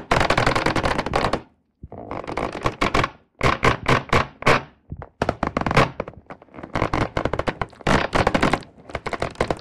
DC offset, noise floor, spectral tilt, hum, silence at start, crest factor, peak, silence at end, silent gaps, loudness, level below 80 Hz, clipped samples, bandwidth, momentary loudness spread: 0.8%; -46 dBFS; -5 dB/octave; none; 0 s; 22 dB; 0 dBFS; 0 s; none; -22 LUFS; -36 dBFS; under 0.1%; 15.5 kHz; 16 LU